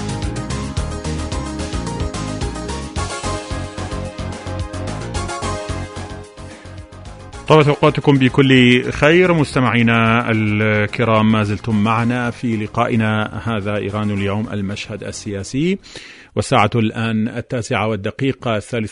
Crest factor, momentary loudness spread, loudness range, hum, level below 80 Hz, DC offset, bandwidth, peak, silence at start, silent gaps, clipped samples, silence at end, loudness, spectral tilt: 18 dB; 14 LU; 12 LU; none; -34 dBFS; under 0.1%; 11 kHz; 0 dBFS; 0 s; none; under 0.1%; 0 s; -18 LUFS; -6 dB/octave